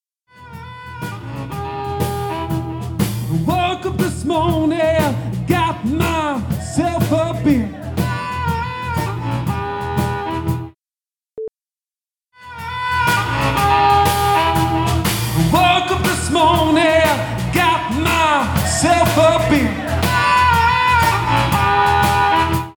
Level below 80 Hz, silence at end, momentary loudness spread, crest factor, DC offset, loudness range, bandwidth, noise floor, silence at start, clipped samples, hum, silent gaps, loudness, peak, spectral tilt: -34 dBFS; 0.05 s; 12 LU; 16 dB; under 0.1%; 9 LU; over 20 kHz; under -90 dBFS; 0.4 s; under 0.1%; none; none; -16 LUFS; -2 dBFS; -5 dB/octave